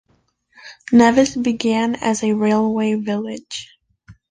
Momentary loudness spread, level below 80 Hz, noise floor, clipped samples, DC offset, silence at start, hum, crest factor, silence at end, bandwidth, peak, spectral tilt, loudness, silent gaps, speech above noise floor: 16 LU; -54 dBFS; -62 dBFS; under 0.1%; under 0.1%; 0.65 s; none; 18 dB; 0.2 s; 9.6 kHz; -2 dBFS; -5 dB/octave; -17 LUFS; none; 45 dB